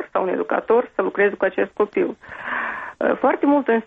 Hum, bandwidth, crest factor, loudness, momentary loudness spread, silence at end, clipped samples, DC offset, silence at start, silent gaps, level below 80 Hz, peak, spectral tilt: none; 4.6 kHz; 14 dB; -21 LUFS; 8 LU; 0 s; under 0.1%; under 0.1%; 0 s; none; -62 dBFS; -6 dBFS; -8 dB/octave